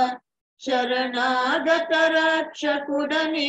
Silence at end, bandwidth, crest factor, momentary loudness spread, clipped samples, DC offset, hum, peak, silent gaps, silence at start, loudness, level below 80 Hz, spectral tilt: 0 s; 8.8 kHz; 14 dB; 7 LU; under 0.1%; under 0.1%; none; -8 dBFS; 0.41-0.57 s; 0 s; -22 LUFS; -70 dBFS; -2 dB/octave